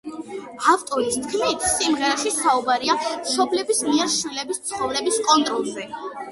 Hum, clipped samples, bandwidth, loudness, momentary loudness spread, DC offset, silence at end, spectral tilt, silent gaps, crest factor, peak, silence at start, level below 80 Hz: none; under 0.1%; 12 kHz; -21 LUFS; 11 LU; under 0.1%; 0 s; -1.5 dB/octave; none; 20 dB; -2 dBFS; 0.05 s; -58 dBFS